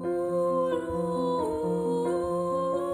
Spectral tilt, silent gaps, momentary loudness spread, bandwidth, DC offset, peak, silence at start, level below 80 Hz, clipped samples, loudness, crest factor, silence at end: -7.5 dB/octave; none; 2 LU; 13 kHz; under 0.1%; -16 dBFS; 0 s; -56 dBFS; under 0.1%; -28 LUFS; 12 dB; 0 s